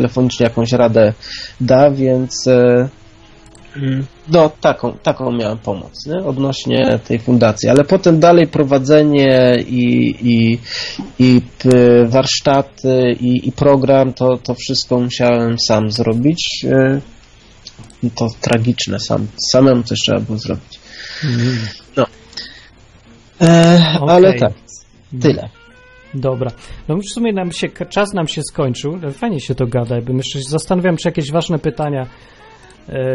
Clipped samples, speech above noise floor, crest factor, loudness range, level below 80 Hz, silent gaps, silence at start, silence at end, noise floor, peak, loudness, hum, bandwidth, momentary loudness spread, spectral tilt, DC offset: under 0.1%; 30 dB; 14 dB; 8 LU; -44 dBFS; none; 0 s; 0 s; -44 dBFS; 0 dBFS; -14 LUFS; none; 11.5 kHz; 13 LU; -6 dB/octave; under 0.1%